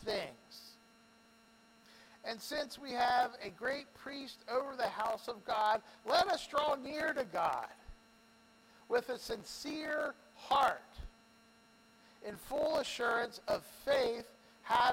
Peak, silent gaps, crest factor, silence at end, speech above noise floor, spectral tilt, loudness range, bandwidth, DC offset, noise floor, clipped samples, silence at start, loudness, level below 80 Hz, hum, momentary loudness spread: -18 dBFS; none; 20 dB; 0 s; 28 dB; -3 dB/octave; 4 LU; 16.5 kHz; under 0.1%; -65 dBFS; under 0.1%; 0 s; -36 LUFS; -64 dBFS; none; 18 LU